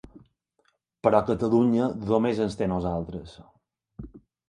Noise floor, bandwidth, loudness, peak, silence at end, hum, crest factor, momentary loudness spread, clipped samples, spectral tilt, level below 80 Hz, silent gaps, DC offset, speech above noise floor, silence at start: -71 dBFS; 10 kHz; -25 LUFS; -4 dBFS; 0.3 s; none; 22 dB; 23 LU; under 0.1%; -8 dB/octave; -50 dBFS; none; under 0.1%; 47 dB; 0.15 s